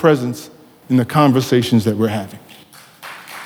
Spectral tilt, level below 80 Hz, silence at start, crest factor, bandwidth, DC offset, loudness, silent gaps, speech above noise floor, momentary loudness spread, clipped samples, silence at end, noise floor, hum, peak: -6.5 dB/octave; -60 dBFS; 0 s; 18 dB; 20 kHz; under 0.1%; -16 LUFS; none; 28 dB; 20 LU; under 0.1%; 0 s; -43 dBFS; none; 0 dBFS